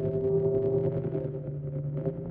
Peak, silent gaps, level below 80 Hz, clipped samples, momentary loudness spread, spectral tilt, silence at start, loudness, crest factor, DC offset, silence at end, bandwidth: -16 dBFS; none; -54 dBFS; under 0.1%; 8 LU; -13.5 dB/octave; 0 s; -30 LUFS; 14 dB; under 0.1%; 0 s; 3.2 kHz